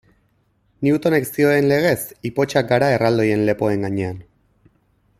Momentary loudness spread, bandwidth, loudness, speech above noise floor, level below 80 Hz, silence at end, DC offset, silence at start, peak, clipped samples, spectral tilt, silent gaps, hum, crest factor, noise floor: 8 LU; 16 kHz; -19 LUFS; 45 dB; -54 dBFS; 1 s; under 0.1%; 0.8 s; -2 dBFS; under 0.1%; -6 dB/octave; none; none; 18 dB; -63 dBFS